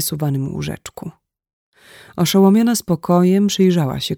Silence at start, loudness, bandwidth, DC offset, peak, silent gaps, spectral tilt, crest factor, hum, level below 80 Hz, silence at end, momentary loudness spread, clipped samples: 0 s; -16 LUFS; 19 kHz; under 0.1%; -2 dBFS; 1.53-1.72 s; -6 dB/octave; 14 dB; none; -50 dBFS; 0 s; 20 LU; under 0.1%